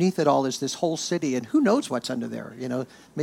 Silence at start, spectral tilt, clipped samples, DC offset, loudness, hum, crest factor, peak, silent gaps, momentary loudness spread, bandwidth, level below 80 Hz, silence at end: 0 s; -5 dB/octave; under 0.1%; under 0.1%; -25 LUFS; none; 18 dB; -8 dBFS; none; 11 LU; 16.5 kHz; -70 dBFS; 0 s